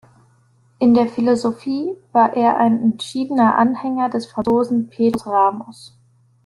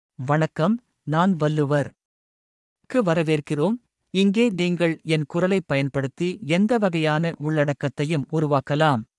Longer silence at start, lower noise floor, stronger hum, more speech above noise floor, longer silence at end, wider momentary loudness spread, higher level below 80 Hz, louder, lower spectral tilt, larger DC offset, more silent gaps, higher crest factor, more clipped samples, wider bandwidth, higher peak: first, 0.8 s vs 0.2 s; second, -56 dBFS vs under -90 dBFS; neither; second, 39 dB vs over 68 dB; first, 0.6 s vs 0.15 s; first, 9 LU vs 6 LU; first, -58 dBFS vs -64 dBFS; first, -18 LUFS vs -23 LUFS; about the same, -6.5 dB/octave vs -7 dB/octave; neither; second, none vs 2.05-2.76 s; about the same, 16 dB vs 16 dB; neither; about the same, 11.5 kHz vs 11.5 kHz; first, -2 dBFS vs -6 dBFS